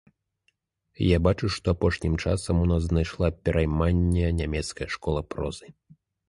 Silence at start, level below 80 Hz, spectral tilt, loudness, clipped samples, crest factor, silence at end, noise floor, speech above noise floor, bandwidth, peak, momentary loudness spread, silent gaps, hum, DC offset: 1 s; -34 dBFS; -6.5 dB/octave; -26 LUFS; under 0.1%; 18 dB; 0.55 s; -73 dBFS; 48 dB; 11.5 kHz; -8 dBFS; 9 LU; none; none; under 0.1%